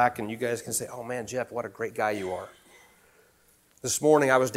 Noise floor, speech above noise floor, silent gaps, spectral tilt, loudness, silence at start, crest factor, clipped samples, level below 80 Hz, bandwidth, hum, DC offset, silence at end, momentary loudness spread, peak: -63 dBFS; 36 dB; none; -4 dB/octave; -28 LUFS; 0 s; 22 dB; under 0.1%; -66 dBFS; 16.5 kHz; none; under 0.1%; 0 s; 14 LU; -6 dBFS